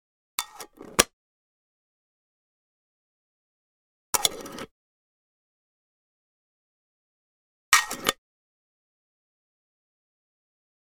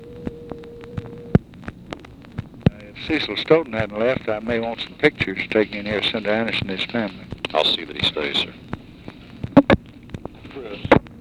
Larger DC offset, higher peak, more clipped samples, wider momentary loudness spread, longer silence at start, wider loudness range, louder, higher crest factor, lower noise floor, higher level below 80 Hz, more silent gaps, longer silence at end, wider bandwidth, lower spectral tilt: neither; about the same, 0 dBFS vs 0 dBFS; neither; first, 21 LU vs 18 LU; first, 0.4 s vs 0 s; about the same, 4 LU vs 2 LU; second, -25 LUFS vs -21 LUFS; first, 34 dB vs 22 dB; first, -45 dBFS vs -40 dBFS; second, -60 dBFS vs -44 dBFS; first, 1.13-4.13 s, 4.71-7.72 s vs none; first, 2.7 s vs 0 s; first, 19 kHz vs 12 kHz; second, 0 dB/octave vs -6.5 dB/octave